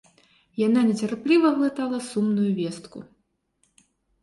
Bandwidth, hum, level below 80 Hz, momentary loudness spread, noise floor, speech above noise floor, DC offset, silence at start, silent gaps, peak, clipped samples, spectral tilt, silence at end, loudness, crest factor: 11.5 kHz; none; -68 dBFS; 18 LU; -70 dBFS; 47 dB; under 0.1%; 0.55 s; none; -8 dBFS; under 0.1%; -6.5 dB/octave; 1.2 s; -23 LUFS; 16 dB